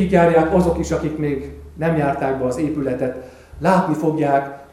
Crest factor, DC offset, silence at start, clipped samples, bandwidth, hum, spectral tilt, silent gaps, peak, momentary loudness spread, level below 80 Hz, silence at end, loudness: 18 dB; under 0.1%; 0 s; under 0.1%; 13.5 kHz; none; -7.5 dB/octave; none; 0 dBFS; 10 LU; -38 dBFS; 0.1 s; -19 LUFS